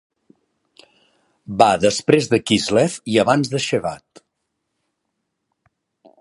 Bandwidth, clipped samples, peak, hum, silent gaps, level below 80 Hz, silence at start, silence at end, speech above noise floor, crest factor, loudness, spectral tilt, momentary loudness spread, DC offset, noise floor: 11.5 kHz; under 0.1%; 0 dBFS; none; none; -56 dBFS; 1.5 s; 2.25 s; 58 dB; 20 dB; -18 LUFS; -4.5 dB/octave; 10 LU; under 0.1%; -76 dBFS